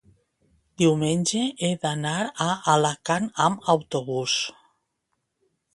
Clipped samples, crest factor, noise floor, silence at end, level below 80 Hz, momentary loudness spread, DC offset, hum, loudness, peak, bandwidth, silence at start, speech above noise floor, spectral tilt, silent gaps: under 0.1%; 22 dB; -77 dBFS; 1.25 s; -64 dBFS; 5 LU; under 0.1%; none; -24 LUFS; -4 dBFS; 11.5 kHz; 0.8 s; 54 dB; -4.5 dB/octave; none